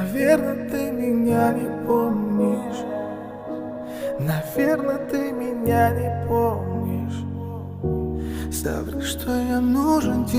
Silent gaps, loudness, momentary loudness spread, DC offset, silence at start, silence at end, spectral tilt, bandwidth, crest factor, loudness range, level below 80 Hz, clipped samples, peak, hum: none; -23 LUFS; 11 LU; under 0.1%; 0 s; 0 s; -6.5 dB/octave; 16.5 kHz; 18 dB; 3 LU; -42 dBFS; under 0.1%; -6 dBFS; none